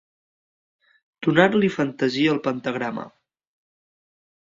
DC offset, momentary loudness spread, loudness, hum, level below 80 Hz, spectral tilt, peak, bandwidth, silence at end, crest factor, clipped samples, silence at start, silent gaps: under 0.1%; 12 LU; -22 LUFS; none; -66 dBFS; -6.5 dB/octave; -2 dBFS; 7.6 kHz; 1.5 s; 24 dB; under 0.1%; 1.2 s; none